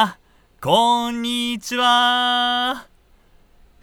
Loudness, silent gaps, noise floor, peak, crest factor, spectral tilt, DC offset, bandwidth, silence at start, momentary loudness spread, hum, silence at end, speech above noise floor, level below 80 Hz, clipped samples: -18 LUFS; none; -53 dBFS; -2 dBFS; 18 dB; -3 dB/octave; under 0.1%; over 20 kHz; 0 s; 9 LU; none; 1 s; 34 dB; -54 dBFS; under 0.1%